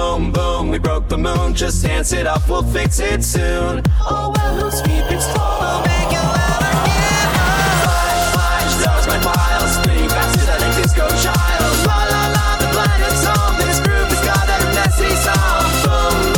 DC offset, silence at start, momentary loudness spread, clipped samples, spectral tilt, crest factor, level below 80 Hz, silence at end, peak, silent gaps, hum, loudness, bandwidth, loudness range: under 0.1%; 0 s; 4 LU; under 0.1%; -4 dB/octave; 12 dB; -20 dBFS; 0 s; -2 dBFS; none; none; -15 LUFS; over 20 kHz; 3 LU